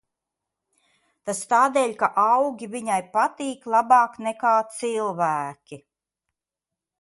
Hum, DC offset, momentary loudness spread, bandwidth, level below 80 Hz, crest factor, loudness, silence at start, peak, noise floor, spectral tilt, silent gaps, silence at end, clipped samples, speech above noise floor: none; under 0.1%; 12 LU; 11.5 kHz; -74 dBFS; 18 dB; -22 LUFS; 1.25 s; -6 dBFS; -88 dBFS; -4 dB/octave; none; 1.25 s; under 0.1%; 66 dB